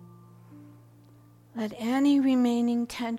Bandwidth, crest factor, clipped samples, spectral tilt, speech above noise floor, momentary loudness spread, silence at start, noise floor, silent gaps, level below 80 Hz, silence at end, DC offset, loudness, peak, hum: 14 kHz; 14 dB; under 0.1%; -5.5 dB/octave; 30 dB; 13 LU; 0 s; -55 dBFS; none; -66 dBFS; 0 s; under 0.1%; -26 LUFS; -14 dBFS; none